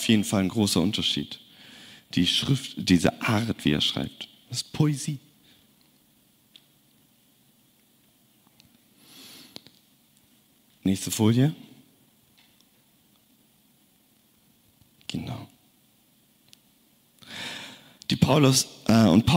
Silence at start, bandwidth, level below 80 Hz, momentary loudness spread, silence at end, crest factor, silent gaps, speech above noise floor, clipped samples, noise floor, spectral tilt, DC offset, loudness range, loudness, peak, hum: 0 s; 16 kHz; -56 dBFS; 24 LU; 0 s; 20 dB; none; 39 dB; under 0.1%; -63 dBFS; -5 dB/octave; under 0.1%; 18 LU; -24 LUFS; -6 dBFS; none